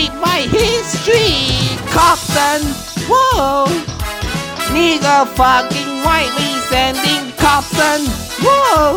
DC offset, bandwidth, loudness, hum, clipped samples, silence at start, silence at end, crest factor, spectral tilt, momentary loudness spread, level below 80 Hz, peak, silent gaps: under 0.1%; 19 kHz; -13 LUFS; none; under 0.1%; 0 s; 0 s; 14 dB; -3.5 dB/octave; 8 LU; -30 dBFS; 0 dBFS; none